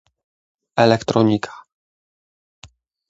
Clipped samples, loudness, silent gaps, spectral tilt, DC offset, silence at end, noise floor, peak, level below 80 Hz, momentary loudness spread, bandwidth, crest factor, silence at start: under 0.1%; -18 LUFS; none; -6.5 dB/octave; under 0.1%; 1.5 s; under -90 dBFS; 0 dBFS; -56 dBFS; 11 LU; 8 kHz; 22 dB; 0.75 s